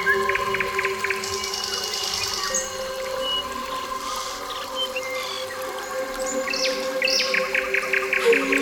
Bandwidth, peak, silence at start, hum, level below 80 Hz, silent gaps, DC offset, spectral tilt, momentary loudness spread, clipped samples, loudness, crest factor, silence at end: 19 kHz; -8 dBFS; 0 s; none; -52 dBFS; none; under 0.1%; -1 dB/octave; 9 LU; under 0.1%; -24 LUFS; 18 dB; 0 s